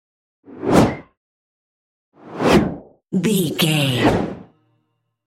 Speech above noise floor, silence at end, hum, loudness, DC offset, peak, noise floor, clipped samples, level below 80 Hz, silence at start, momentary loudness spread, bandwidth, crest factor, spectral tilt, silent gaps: 52 dB; 0.85 s; none; -18 LUFS; under 0.1%; -2 dBFS; -69 dBFS; under 0.1%; -42 dBFS; 0.5 s; 18 LU; 16 kHz; 20 dB; -5.5 dB/octave; 1.17-2.12 s